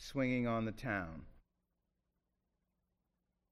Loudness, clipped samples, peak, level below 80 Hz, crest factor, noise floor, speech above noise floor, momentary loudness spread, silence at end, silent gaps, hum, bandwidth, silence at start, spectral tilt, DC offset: -38 LUFS; under 0.1%; -24 dBFS; -60 dBFS; 18 dB; -86 dBFS; 48 dB; 13 LU; 2.2 s; none; none; 14 kHz; 0 s; -6.5 dB/octave; under 0.1%